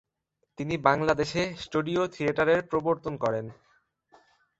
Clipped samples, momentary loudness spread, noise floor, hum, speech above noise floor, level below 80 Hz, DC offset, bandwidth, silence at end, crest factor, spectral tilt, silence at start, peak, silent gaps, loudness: under 0.1%; 9 LU; -78 dBFS; none; 51 dB; -58 dBFS; under 0.1%; 8.2 kHz; 1.05 s; 24 dB; -6 dB/octave; 0.6 s; -6 dBFS; none; -27 LUFS